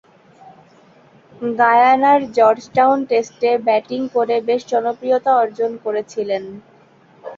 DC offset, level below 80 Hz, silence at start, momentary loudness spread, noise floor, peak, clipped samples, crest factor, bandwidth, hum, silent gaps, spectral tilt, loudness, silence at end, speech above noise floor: under 0.1%; -66 dBFS; 1.4 s; 11 LU; -50 dBFS; -2 dBFS; under 0.1%; 16 dB; 7.4 kHz; none; none; -5 dB/octave; -17 LUFS; 0.05 s; 33 dB